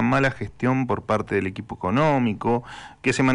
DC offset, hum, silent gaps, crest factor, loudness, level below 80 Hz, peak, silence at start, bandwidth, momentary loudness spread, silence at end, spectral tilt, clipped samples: under 0.1%; none; none; 10 dB; -23 LUFS; -50 dBFS; -12 dBFS; 0 s; 11 kHz; 7 LU; 0 s; -6.5 dB/octave; under 0.1%